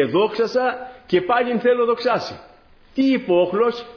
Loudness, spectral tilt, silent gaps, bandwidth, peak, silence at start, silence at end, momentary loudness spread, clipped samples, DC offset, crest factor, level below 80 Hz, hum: -19 LUFS; -6.5 dB/octave; none; 5.4 kHz; -4 dBFS; 0 s; 0 s; 11 LU; under 0.1%; under 0.1%; 14 dB; -58 dBFS; none